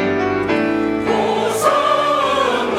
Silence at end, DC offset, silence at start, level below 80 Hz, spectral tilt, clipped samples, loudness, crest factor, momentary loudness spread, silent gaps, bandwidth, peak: 0 s; under 0.1%; 0 s; -50 dBFS; -4.5 dB/octave; under 0.1%; -17 LUFS; 14 dB; 3 LU; none; 17 kHz; -2 dBFS